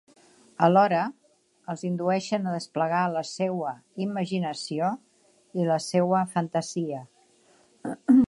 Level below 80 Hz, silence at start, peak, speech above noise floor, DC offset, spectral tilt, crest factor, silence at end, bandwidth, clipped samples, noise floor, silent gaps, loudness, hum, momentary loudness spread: -72 dBFS; 0.6 s; -6 dBFS; 36 dB; under 0.1%; -6 dB/octave; 20 dB; 0 s; 11.5 kHz; under 0.1%; -61 dBFS; none; -27 LUFS; none; 15 LU